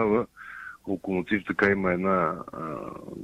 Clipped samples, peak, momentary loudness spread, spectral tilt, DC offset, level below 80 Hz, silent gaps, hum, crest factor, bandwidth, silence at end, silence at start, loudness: under 0.1%; -8 dBFS; 16 LU; -8 dB/octave; under 0.1%; -56 dBFS; none; none; 18 dB; 11.5 kHz; 0 s; 0 s; -27 LUFS